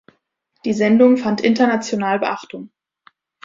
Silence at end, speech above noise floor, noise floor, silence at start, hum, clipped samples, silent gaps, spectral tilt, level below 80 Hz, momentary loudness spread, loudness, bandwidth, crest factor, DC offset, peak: 0.8 s; 51 dB; -67 dBFS; 0.65 s; none; under 0.1%; none; -5.5 dB/octave; -62 dBFS; 16 LU; -17 LUFS; 7.6 kHz; 16 dB; under 0.1%; -2 dBFS